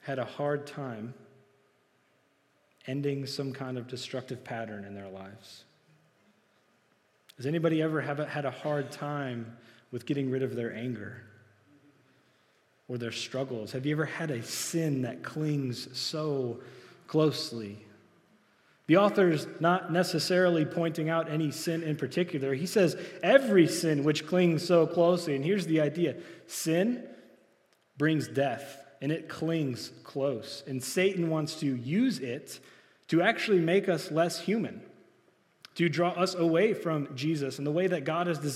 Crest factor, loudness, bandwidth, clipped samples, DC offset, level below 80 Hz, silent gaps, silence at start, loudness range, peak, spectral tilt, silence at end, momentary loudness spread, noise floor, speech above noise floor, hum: 24 dB; -30 LUFS; 15.5 kHz; under 0.1%; under 0.1%; -82 dBFS; none; 0.05 s; 11 LU; -8 dBFS; -5.5 dB/octave; 0 s; 15 LU; -69 dBFS; 40 dB; none